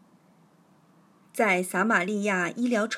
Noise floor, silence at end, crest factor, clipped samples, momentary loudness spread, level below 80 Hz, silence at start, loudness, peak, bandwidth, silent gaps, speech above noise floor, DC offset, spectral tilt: -60 dBFS; 0 s; 20 dB; under 0.1%; 3 LU; -90 dBFS; 1.35 s; -25 LUFS; -8 dBFS; 16 kHz; none; 35 dB; under 0.1%; -4.5 dB/octave